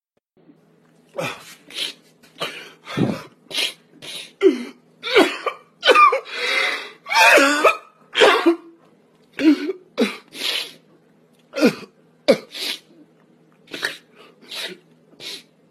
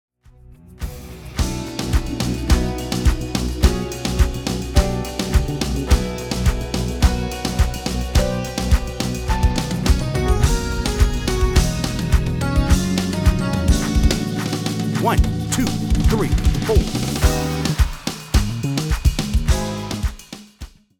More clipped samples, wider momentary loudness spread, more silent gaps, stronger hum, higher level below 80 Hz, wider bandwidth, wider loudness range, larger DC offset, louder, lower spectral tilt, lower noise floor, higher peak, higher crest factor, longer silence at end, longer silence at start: neither; first, 20 LU vs 6 LU; neither; neither; second, -68 dBFS vs -22 dBFS; second, 13.5 kHz vs 18.5 kHz; first, 12 LU vs 2 LU; neither; about the same, -19 LUFS vs -20 LUFS; second, -3 dB/octave vs -5.5 dB/octave; first, -57 dBFS vs -46 dBFS; about the same, 0 dBFS vs 0 dBFS; about the same, 22 dB vs 18 dB; about the same, 0.3 s vs 0.3 s; first, 1.15 s vs 0.5 s